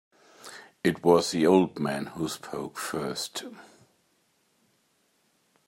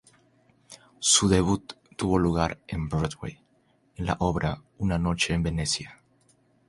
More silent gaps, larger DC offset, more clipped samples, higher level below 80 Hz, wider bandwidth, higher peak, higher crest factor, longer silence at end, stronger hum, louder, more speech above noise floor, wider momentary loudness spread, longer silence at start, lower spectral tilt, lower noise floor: neither; neither; neither; second, -68 dBFS vs -42 dBFS; first, 16 kHz vs 11.5 kHz; about the same, -6 dBFS vs -6 dBFS; about the same, 22 dB vs 22 dB; first, 2.05 s vs 0.75 s; neither; about the same, -27 LUFS vs -26 LUFS; first, 44 dB vs 40 dB; first, 23 LU vs 13 LU; second, 0.45 s vs 0.7 s; about the same, -5 dB/octave vs -4 dB/octave; first, -70 dBFS vs -66 dBFS